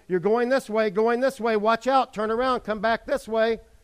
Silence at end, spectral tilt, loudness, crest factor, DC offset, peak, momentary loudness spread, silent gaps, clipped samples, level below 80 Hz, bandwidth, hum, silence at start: 0.25 s; -5 dB/octave; -24 LUFS; 16 dB; under 0.1%; -8 dBFS; 4 LU; none; under 0.1%; -54 dBFS; 15 kHz; none; 0.1 s